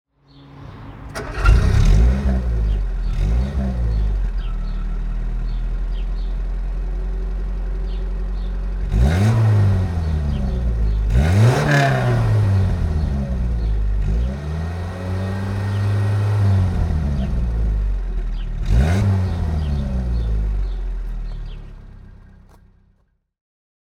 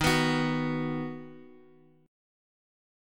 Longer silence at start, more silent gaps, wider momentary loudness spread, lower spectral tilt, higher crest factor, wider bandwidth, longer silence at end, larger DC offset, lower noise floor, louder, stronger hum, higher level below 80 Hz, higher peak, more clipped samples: first, 0.45 s vs 0 s; neither; second, 12 LU vs 18 LU; first, -7.5 dB/octave vs -5 dB/octave; about the same, 18 dB vs 22 dB; second, 11 kHz vs 17.5 kHz; about the same, 1.6 s vs 1.55 s; neither; about the same, -61 dBFS vs -58 dBFS; first, -21 LUFS vs -29 LUFS; neither; first, -22 dBFS vs -54 dBFS; first, 0 dBFS vs -10 dBFS; neither